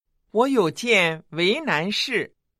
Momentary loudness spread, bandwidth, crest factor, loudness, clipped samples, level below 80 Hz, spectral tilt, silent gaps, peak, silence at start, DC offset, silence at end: 6 LU; 14.5 kHz; 18 dB; -21 LUFS; under 0.1%; -70 dBFS; -4 dB/octave; none; -6 dBFS; 0.35 s; under 0.1%; 0.35 s